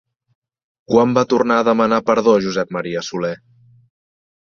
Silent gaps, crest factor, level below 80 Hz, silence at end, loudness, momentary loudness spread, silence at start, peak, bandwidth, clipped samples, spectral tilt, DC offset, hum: none; 16 dB; -58 dBFS; 1.25 s; -17 LUFS; 9 LU; 0.9 s; -2 dBFS; 7.4 kHz; under 0.1%; -6 dB/octave; under 0.1%; none